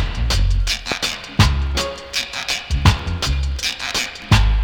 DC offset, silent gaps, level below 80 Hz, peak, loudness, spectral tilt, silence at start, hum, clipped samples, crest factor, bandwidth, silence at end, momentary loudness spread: under 0.1%; none; -22 dBFS; -2 dBFS; -20 LUFS; -4 dB/octave; 0 s; none; under 0.1%; 16 dB; 18 kHz; 0 s; 6 LU